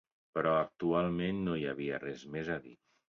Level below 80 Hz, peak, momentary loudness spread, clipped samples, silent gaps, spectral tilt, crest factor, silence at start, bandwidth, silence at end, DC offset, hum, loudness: -62 dBFS; -18 dBFS; 9 LU; under 0.1%; none; -5.5 dB/octave; 18 dB; 0.35 s; 7.2 kHz; 0.35 s; under 0.1%; none; -35 LUFS